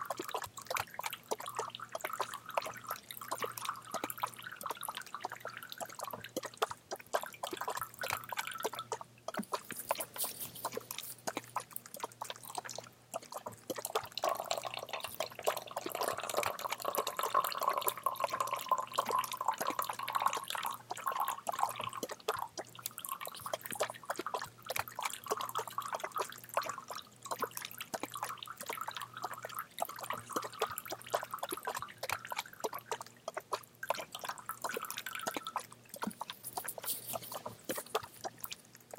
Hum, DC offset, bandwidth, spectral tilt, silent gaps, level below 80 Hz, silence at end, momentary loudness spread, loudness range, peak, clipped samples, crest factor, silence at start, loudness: none; under 0.1%; 17 kHz; -1.5 dB/octave; none; -78 dBFS; 0 s; 9 LU; 6 LU; -12 dBFS; under 0.1%; 28 dB; 0 s; -40 LUFS